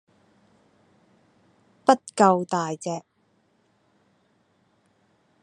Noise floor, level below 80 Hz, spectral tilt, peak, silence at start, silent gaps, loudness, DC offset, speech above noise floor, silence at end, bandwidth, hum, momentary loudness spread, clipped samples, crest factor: -67 dBFS; -78 dBFS; -5.5 dB/octave; 0 dBFS; 1.9 s; none; -23 LUFS; under 0.1%; 45 dB; 2.45 s; 11 kHz; none; 13 LU; under 0.1%; 28 dB